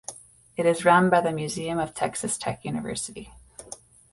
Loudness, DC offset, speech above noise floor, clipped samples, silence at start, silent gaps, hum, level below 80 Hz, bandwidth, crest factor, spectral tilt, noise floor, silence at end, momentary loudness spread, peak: -25 LUFS; under 0.1%; 22 dB; under 0.1%; 0.1 s; none; none; -56 dBFS; 11.5 kHz; 20 dB; -4.5 dB/octave; -46 dBFS; 0.4 s; 24 LU; -6 dBFS